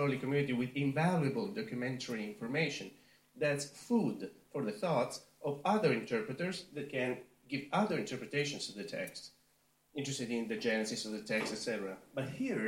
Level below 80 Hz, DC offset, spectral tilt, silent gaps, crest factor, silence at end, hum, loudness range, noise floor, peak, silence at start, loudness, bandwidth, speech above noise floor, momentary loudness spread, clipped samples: -76 dBFS; under 0.1%; -5 dB/octave; none; 18 dB; 0 s; none; 3 LU; -73 dBFS; -18 dBFS; 0 s; -36 LUFS; 16.5 kHz; 37 dB; 10 LU; under 0.1%